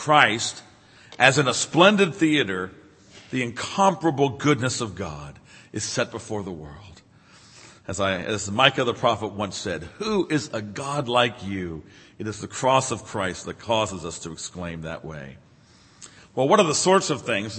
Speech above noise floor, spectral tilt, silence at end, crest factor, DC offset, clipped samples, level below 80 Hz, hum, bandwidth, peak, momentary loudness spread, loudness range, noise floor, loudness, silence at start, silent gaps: 31 dB; -4 dB/octave; 0 s; 24 dB; under 0.1%; under 0.1%; -56 dBFS; none; 8.8 kHz; 0 dBFS; 17 LU; 9 LU; -54 dBFS; -23 LUFS; 0 s; none